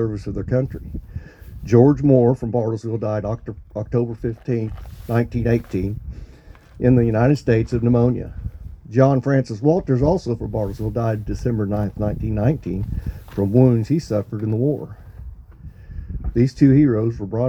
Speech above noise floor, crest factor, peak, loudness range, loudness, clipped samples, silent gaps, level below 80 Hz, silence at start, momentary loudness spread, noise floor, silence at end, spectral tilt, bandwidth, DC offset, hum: 25 dB; 18 dB; 0 dBFS; 5 LU; -20 LUFS; under 0.1%; none; -36 dBFS; 0 s; 19 LU; -44 dBFS; 0 s; -9.5 dB/octave; 8.2 kHz; under 0.1%; none